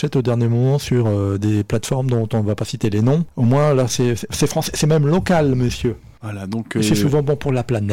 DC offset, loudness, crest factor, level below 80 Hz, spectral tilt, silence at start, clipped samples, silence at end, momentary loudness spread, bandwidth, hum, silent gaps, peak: under 0.1%; -18 LUFS; 10 dB; -40 dBFS; -6.5 dB/octave; 0 s; under 0.1%; 0 s; 7 LU; 17 kHz; none; none; -8 dBFS